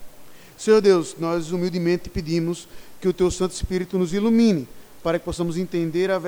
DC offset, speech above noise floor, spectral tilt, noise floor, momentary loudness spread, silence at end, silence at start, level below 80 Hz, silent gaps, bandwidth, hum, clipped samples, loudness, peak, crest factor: under 0.1%; 23 dB; -6 dB/octave; -44 dBFS; 9 LU; 0 s; 0 s; -42 dBFS; none; 19.5 kHz; none; under 0.1%; -22 LUFS; -6 dBFS; 18 dB